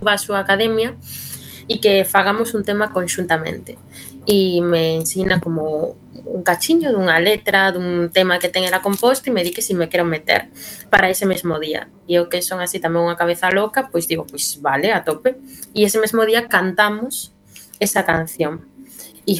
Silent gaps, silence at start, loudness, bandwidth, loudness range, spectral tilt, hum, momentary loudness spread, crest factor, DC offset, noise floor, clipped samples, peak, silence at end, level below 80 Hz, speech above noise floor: none; 0 s; -18 LUFS; 18 kHz; 3 LU; -3.5 dB/octave; none; 13 LU; 18 dB; under 0.1%; -40 dBFS; under 0.1%; 0 dBFS; 0 s; -52 dBFS; 22 dB